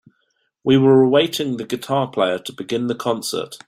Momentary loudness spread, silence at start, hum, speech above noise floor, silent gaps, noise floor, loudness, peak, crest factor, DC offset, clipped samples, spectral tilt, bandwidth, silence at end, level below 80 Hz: 12 LU; 0.65 s; none; 50 dB; none; -68 dBFS; -19 LUFS; -2 dBFS; 16 dB; under 0.1%; under 0.1%; -5.5 dB/octave; 16 kHz; 0.1 s; -62 dBFS